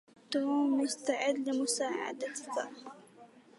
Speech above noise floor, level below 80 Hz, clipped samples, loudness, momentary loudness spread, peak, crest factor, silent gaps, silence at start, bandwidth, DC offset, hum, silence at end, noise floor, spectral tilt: 25 dB; -90 dBFS; under 0.1%; -33 LUFS; 11 LU; -18 dBFS; 18 dB; none; 0.3 s; 11.5 kHz; under 0.1%; none; 0.2 s; -58 dBFS; -2 dB/octave